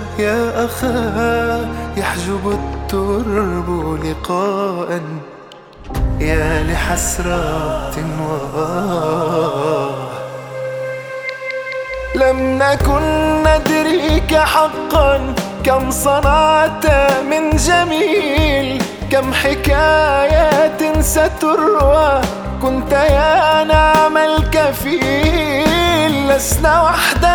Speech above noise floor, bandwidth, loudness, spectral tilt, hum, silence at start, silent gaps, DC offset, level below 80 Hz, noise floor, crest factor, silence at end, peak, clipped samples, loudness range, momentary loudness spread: 23 dB; over 20 kHz; -15 LUFS; -4.5 dB/octave; none; 0 s; none; under 0.1%; -24 dBFS; -37 dBFS; 14 dB; 0 s; 0 dBFS; under 0.1%; 7 LU; 11 LU